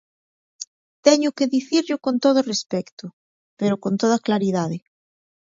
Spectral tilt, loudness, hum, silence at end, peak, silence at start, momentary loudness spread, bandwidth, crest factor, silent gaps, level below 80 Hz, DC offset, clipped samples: -5 dB/octave; -21 LUFS; none; 0.7 s; 0 dBFS; 0.6 s; 19 LU; 7.8 kHz; 22 dB; 0.67-1.03 s, 2.92-2.97 s, 3.13-3.57 s; -68 dBFS; under 0.1%; under 0.1%